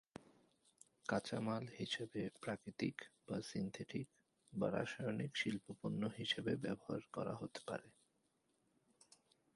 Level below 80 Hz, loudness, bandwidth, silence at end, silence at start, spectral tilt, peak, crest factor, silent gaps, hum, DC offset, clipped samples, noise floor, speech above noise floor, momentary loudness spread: -76 dBFS; -44 LUFS; 11.5 kHz; 1.65 s; 1.05 s; -5.5 dB/octave; -24 dBFS; 22 dB; none; none; under 0.1%; under 0.1%; -82 dBFS; 38 dB; 8 LU